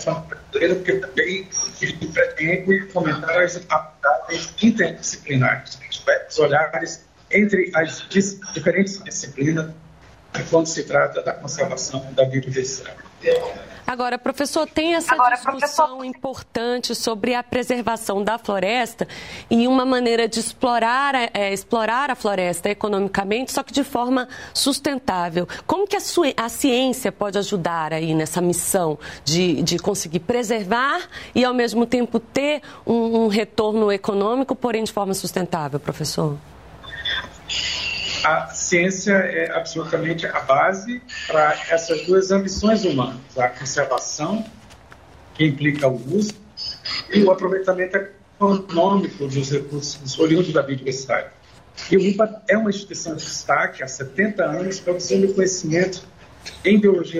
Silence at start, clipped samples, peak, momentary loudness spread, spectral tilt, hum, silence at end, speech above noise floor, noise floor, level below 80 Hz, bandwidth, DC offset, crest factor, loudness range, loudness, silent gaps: 0 s; under 0.1%; -4 dBFS; 9 LU; -4.5 dB/octave; none; 0 s; 26 dB; -47 dBFS; -52 dBFS; 16 kHz; 0.1%; 16 dB; 3 LU; -21 LUFS; none